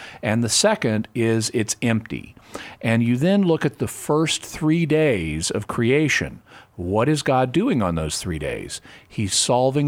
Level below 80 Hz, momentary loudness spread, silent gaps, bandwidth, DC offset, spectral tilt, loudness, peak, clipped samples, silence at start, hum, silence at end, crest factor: -46 dBFS; 14 LU; none; 16.5 kHz; under 0.1%; -4.5 dB/octave; -21 LUFS; -6 dBFS; under 0.1%; 0 s; none; 0 s; 16 dB